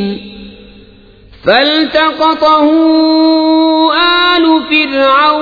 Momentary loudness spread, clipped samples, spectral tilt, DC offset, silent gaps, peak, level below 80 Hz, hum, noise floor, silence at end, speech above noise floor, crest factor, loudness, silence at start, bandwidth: 3 LU; under 0.1%; -5.5 dB/octave; under 0.1%; none; 0 dBFS; -44 dBFS; none; -39 dBFS; 0 s; 30 dB; 10 dB; -9 LUFS; 0 s; 5 kHz